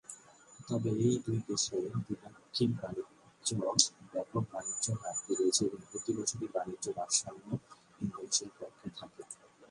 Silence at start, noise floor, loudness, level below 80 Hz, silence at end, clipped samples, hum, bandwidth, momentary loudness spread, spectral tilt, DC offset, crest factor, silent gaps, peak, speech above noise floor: 0.1 s; -57 dBFS; -34 LUFS; -68 dBFS; 0.05 s; under 0.1%; none; 11.5 kHz; 18 LU; -4 dB/octave; under 0.1%; 30 dB; none; -6 dBFS; 21 dB